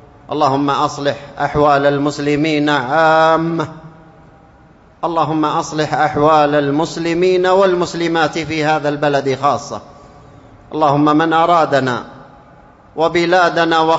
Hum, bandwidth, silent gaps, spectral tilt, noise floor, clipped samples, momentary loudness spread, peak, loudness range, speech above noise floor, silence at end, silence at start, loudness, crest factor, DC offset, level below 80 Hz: none; 8 kHz; none; -5.5 dB/octave; -45 dBFS; under 0.1%; 9 LU; 0 dBFS; 3 LU; 31 dB; 0 s; 0.3 s; -15 LUFS; 14 dB; under 0.1%; -48 dBFS